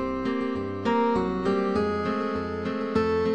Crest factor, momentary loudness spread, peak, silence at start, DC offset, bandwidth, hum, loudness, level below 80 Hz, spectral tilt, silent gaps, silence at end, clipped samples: 16 dB; 6 LU; -10 dBFS; 0 s; 0.3%; 9.4 kHz; none; -26 LUFS; -50 dBFS; -7.5 dB/octave; none; 0 s; under 0.1%